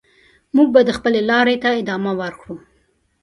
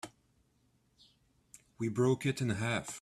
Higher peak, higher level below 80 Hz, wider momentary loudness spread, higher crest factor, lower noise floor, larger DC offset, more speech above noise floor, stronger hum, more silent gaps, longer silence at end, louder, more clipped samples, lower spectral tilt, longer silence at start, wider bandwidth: first, 0 dBFS vs -18 dBFS; first, -54 dBFS vs -68 dBFS; first, 20 LU vs 9 LU; about the same, 18 dB vs 18 dB; second, -62 dBFS vs -73 dBFS; neither; first, 45 dB vs 40 dB; neither; neither; first, 0.65 s vs 0 s; first, -16 LUFS vs -33 LUFS; neither; about the same, -6 dB/octave vs -5.5 dB/octave; first, 0.55 s vs 0.05 s; second, 11.5 kHz vs 13.5 kHz